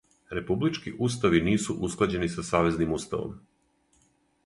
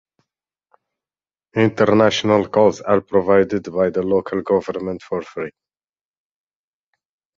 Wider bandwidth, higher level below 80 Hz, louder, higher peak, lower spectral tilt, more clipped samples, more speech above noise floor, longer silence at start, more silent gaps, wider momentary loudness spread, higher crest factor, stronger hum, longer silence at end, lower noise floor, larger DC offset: first, 11.5 kHz vs 7.6 kHz; first, -48 dBFS vs -54 dBFS; second, -27 LUFS vs -18 LUFS; second, -8 dBFS vs -2 dBFS; about the same, -5.5 dB/octave vs -6 dB/octave; neither; second, 40 dB vs over 73 dB; second, 0.3 s vs 1.55 s; neither; about the same, 10 LU vs 12 LU; about the same, 20 dB vs 18 dB; neither; second, 1.1 s vs 1.9 s; second, -67 dBFS vs under -90 dBFS; neither